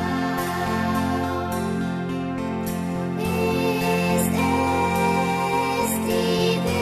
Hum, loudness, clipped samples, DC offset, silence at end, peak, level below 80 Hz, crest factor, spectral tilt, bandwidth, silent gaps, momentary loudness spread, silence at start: none; -23 LUFS; under 0.1%; under 0.1%; 0 s; -10 dBFS; -46 dBFS; 14 dB; -5.5 dB/octave; 14 kHz; none; 6 LU; 0 s